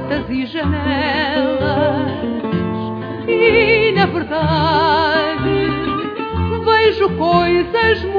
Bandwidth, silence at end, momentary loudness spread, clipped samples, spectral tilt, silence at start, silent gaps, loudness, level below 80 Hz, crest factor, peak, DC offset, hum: 5.2 kHz; 0 s; 9 LU; under 0.1%; -8 dB/octave; 0 s; none; -16 LUFS; -36 dBFS; 14 dB; -2 dBFS; under 0.1%; none